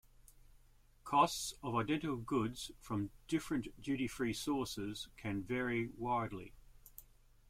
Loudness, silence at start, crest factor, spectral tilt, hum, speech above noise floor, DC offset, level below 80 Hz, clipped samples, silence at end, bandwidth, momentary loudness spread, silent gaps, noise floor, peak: -39 LUFS; 0.35 s; 22 dB; -5 dB/octave; none; 27 dB; under 0.1%; -60 dBFS; under 0.1%; 0.45 s; 16.5 kHz; 16 LU; none; -66 dBFS; -16 dBFS